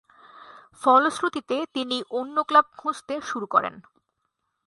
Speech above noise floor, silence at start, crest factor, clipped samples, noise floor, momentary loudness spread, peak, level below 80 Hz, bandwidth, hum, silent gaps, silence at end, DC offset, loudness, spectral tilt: 53 dB; 0.35 s; 20 dB; under 0.1%; -77 dBFS; 12 LU; -6 dBFS; -72 dBFS; 11.5 kHz; none; none; 0.85 s; under 0.1%; -24 LUFS; -3 dB/octave